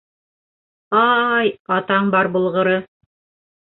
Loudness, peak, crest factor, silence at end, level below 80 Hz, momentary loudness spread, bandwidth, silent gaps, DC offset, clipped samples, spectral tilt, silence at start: -17 LUFS; -2 dBFS; 16 dB; 0.8 s; -62 dBFS; 5 LU; 4.2 kHz; 1.60-1.65 s; under 0.1%; under 0.1%; -10.5 dB/octave; 0.9 s